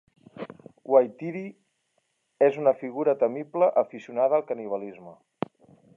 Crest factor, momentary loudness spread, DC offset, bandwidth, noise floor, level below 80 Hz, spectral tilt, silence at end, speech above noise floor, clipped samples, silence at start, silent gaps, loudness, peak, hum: 20 dB; 19 LU; under 0.1%; 4 kHz; -74 dBFS; -80 dBFS; -8.5 dB/octave; 0.8 s; 49 dB; under 0.1%; 0.35 s; none; -25 LUFS; -6 dBFS; none